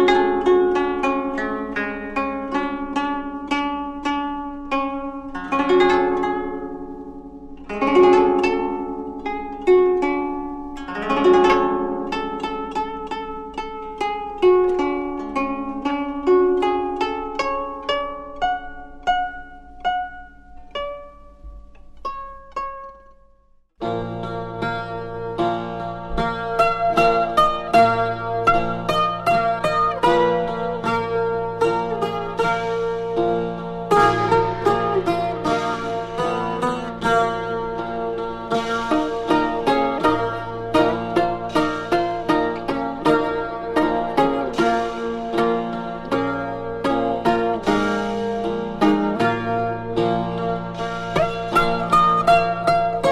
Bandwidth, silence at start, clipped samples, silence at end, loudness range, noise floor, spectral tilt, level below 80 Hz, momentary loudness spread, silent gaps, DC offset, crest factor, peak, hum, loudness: 12.5 kHz; 0 s; under 0.1%; 0 s; 8 LU; -55 dBFS; -6 dB/octave; -42 dBFS; 13 LU; none; under 0.1%; 16 dB; -4 dBFS; none; -21 LUFS